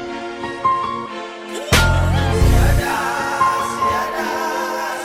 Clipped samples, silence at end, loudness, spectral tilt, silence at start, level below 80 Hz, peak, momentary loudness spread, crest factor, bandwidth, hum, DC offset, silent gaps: under 0.1%; 0 s; -18 LUFS; -4.5 dB/octave; 0 s; -24 dBFS; -2 dBFS; 12 LU; 16 dB; 16.5 kHz; none; under 0.1%; none